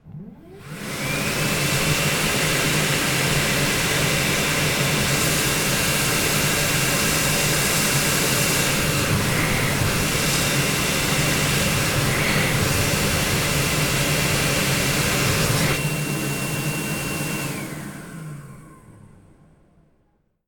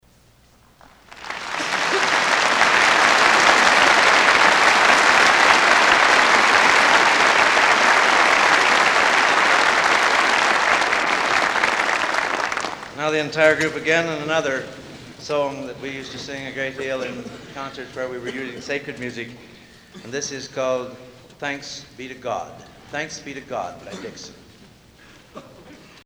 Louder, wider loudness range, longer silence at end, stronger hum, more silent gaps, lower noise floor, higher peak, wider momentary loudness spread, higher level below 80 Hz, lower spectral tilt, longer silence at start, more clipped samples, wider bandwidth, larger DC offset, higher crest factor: second, -20 LUFS vs -16 LUFS; second, 7 LU vs 18 LU; first, 1.5 s vs 0.3 s; neither; neither; first, -65 dBFS vs -54 dBFS; second, -6 dBFS vs 0 dBFS; second, 7 LU vs 19 LU; first, -38 dBFS vs -54 dBFS; first, -3 dB/octave vs -1.5 dB/octave; second, 0.05 s vs 1.15 s; neither; about the same, 19 kHz vs over 20 kHz; neither; about the same, 16 dB vs 20 dB